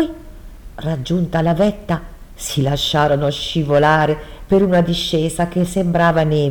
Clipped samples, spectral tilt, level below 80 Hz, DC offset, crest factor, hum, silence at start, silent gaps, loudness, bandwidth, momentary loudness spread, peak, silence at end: under 0.1%; -6 dB/octave; -36 dBFS; under 0.1%; 16 dB; none; 0 s; none; -17 LUFS; 19.5 kHz; 10 LU; -2 dBFS; 0 s